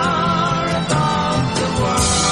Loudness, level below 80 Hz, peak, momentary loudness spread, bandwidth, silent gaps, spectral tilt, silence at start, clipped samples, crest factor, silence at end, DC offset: -17 LUFS; -36 dBFS; -4 dBFS; 3 LU; 11.5 kHz; none; -4 dB/octave; 0 s; under 0.1%; 14 dB; 0 s; under 0.1%